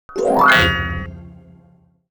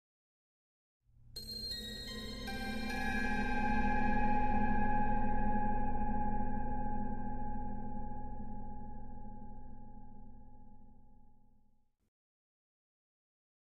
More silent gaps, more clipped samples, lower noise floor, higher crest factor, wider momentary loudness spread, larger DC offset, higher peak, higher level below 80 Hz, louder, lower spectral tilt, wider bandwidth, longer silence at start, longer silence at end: neither; neither; second, -53 dBFS vs -65 dBFS; about the same, 18 dB vs 16 dB; about the same, 17 LU vs 19 LU; neither; first, -2 dBFS vs -20 dBFS; about the same, -36 dBFS vs -40 dBFS; first, -14 LUFS vs -38 LUFS; about the same, -4.5 dB/octave vs -5.5 dB/octave; first, over 20 kHz vs 13.5 kHz; second, 0.1 s vs 1.35 s; second, 0.8 s vs 2.45 s